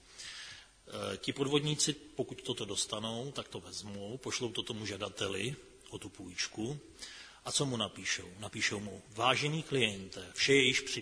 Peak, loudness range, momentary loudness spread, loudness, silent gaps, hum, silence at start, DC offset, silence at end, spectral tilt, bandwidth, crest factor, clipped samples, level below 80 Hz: -12 dBFS; 7 LU; 16 LU; -34 LUFS; none; none; 0.1 s; under 0.1%; 0 s; -3 dB/octave; 11 kHz; 24 dB; under 0.1%; -66 dBFS